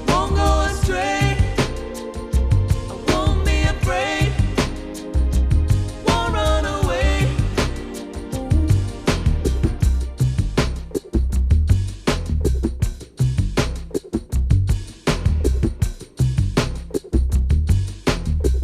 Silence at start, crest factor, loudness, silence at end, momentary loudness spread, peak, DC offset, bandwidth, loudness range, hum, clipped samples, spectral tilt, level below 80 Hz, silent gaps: 0 s; 16 dB; -21 LUFS; 0 s; 7 LU; -2 dBFS; under 0.1%; 14.5 kHz; 2 LU; none; under 0.1%; -6 dB/octave; -22 dBFS; none